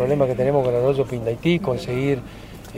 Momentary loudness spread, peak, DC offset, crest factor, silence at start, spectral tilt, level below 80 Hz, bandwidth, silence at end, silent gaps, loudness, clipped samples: 7 LU; -6 dBFS; under 0.1%; 16 dB; 0 s; -7.5 dB/octave; -44 dBFS; 16 kHz; 0 s; none; -21 LUFS; under 0.1%